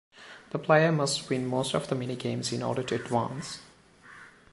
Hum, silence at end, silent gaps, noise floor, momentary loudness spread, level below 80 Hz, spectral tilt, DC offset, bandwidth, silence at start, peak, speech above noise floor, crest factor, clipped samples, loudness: none; 0.25 s; none; -53 dBFS; 22 LU; -66 dBFS; -5 dB/octave; under 0.1%; 11.5 kHz; 0.15 s; -8 dBFS; 25 dB; 22 dB; under 0.1%; -28 LUFS